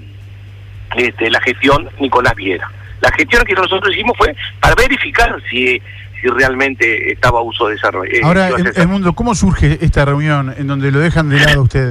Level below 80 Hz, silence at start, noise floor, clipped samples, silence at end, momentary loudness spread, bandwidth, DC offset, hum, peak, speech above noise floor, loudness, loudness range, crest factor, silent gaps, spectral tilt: -26 dBFS; 0 s; -32 dBFS; under 0.1%; 0 s; 6 LU; 15.5 kHz; under 0.1%; 50 Hz at -35 dBFS; -2 dBFS; 20 dB; -12 LUFS; 1 LU; 12 dB; none; -5.5 dB/octave